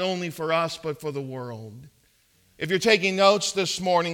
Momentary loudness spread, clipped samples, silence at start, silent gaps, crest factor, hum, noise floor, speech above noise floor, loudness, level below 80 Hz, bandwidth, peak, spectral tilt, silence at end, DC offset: 16 LU; under 0.1%; 0 s; none; 22 dB; none; -63 dBFS; 38 dB; -24 LUFS; -66 dBFS; 18 kHz; -4 dBFS; -3.5 dB/octave; 0 s; under 0.1%